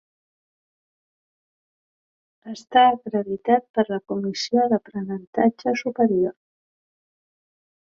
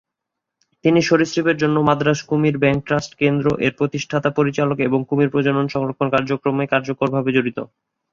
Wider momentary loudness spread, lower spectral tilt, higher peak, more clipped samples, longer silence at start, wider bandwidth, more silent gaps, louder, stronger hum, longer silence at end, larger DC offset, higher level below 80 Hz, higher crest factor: first, 11 LU vs 5 LU; about the same, -5.5 dB/octave vs -6.5 dB/octave; about the same, -4 dBFS vs -2 dBFS; neither; first, 2.45 s vs 0.85 s; about the same, 7.4 kHz vs 7.4 kHz; first, 3.70-3.74 s, 5.27-5.33 s vs none; second, -22 LUFS vs -19 LUFS; neither; first, 1.6 s vs 0.45 s; neither; second, -68 dBFS vs -54 dBFS; about the same, 20 dB vs 18 dB